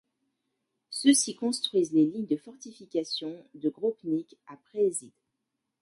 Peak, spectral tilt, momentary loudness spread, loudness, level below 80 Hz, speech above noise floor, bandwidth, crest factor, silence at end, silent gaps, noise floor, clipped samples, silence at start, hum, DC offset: -8 dBFS; -3.5 dB/octave; 17 LU; -28 LUFS; -80 dBFS; 55 dB; 11.5 kHz; 22 dB; 0.75 s; none; -83 dBFS; under 0.1%; 0.9 s; none; under 0.1%